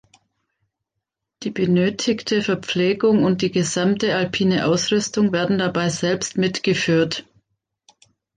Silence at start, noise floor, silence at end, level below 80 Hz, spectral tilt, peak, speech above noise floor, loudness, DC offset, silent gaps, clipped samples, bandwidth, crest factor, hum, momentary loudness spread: 1.4 s; -81 dBFS; 1.15 s; -58 dBFS; -5 dB/octave; -6 dBFS; 62 dB; -20 LUFS; under 0.1%; none; under 0.1%; 9.6 kHz; 14 dB; none; 4 LU